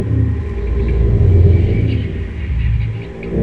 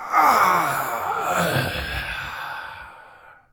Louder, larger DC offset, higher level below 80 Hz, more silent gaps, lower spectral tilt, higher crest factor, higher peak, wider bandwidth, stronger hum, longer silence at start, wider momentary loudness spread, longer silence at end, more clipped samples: first, -16 LUFS vs -21 LUFS; neither; first, -20 dBFS vs -44 dBFS; neither; first, -10 dB/octave vs -3.5 dB/octave; second, 14 dB vs 20 dB; about the same, 0 dBFS vs -2 dBFS; second, 4.8 kHz vs 19.5 kHz; neither; about the same, 0 s vs 0 s; second, 12 LU vs 18 LU; second, 0 s vs 0.2 s; neither